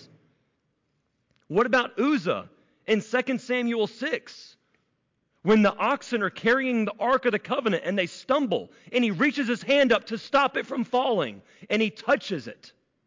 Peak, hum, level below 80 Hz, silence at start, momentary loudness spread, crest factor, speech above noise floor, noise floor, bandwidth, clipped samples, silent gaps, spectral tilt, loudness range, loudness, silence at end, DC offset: -12 dBFS; none; -68 dBFS; 1.5 s; 8 LU; 14 dB; 49 dB; -74 dBFS; 7.6 kHz; under 0.1%; none; -5.5 dB/octave; 3 LU; -25 LUFS; 0.4 s; under 0.1%